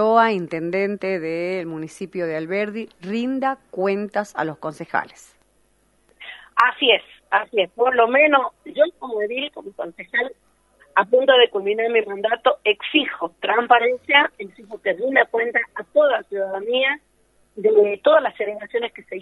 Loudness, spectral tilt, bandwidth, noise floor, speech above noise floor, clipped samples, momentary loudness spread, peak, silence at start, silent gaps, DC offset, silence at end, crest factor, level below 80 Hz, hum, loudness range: -20 LUFS; -5 dB/octave; 11.5 kHz; -62 dBFS; 42 dB; under 0.1%; 13 LU; 0 dBFS; 0 s; none; under 0.1%; 0 s; 20 dB; -68 dBFS; none; 7 LU